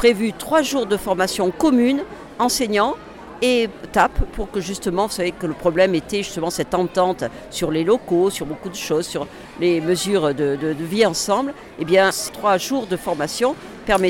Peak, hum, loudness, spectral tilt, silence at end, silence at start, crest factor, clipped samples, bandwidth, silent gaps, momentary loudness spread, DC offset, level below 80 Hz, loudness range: -4 dBFS; none; -20 LUFS; -4 dB/octave; 0 s; 0 s; 16 dB; under 0.1%; 17 kHz; none; 10 LU; under 0.1%; -38 dBFS; 2 LU